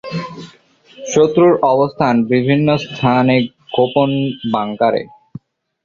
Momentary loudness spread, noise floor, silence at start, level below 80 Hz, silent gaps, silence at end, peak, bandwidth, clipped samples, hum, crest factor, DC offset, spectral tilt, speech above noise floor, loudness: 14 LU; -47 dBFS; 0.05 s; -52 dBFS; none; 0.75 s; 0 dBFS; 7.4 kHz; under 0.1%; none; 14 dB; under 0.1%; -6.5 dB/octave; 33 dB; -15 LUFS